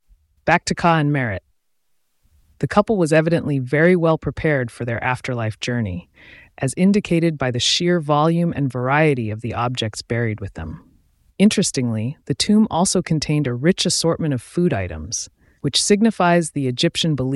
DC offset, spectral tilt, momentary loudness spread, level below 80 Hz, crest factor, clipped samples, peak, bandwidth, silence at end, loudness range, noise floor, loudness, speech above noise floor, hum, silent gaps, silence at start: under 0.1%; -5 dB/octave; 10 LU; -46 dBFS; 18 dB; under 0.1%; -2 dBFS; 12 kHz; 0 s; 3 LU; -70 dBFS; -19 LUFS; 52 dB; none; none; 0.45 s